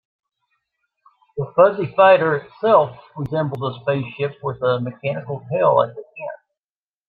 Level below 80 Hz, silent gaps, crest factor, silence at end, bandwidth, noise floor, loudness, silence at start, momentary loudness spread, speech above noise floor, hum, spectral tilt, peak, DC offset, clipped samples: -62 dBFS; none; 18 dB; 0.75 s; 4.6 kHz; under -90 dBFS; -19 LUFS; 1.35 s; 16 LU; over 71 dB; none; -9 dB/octave; -2 dBFS; under 0.1%; under 0.1%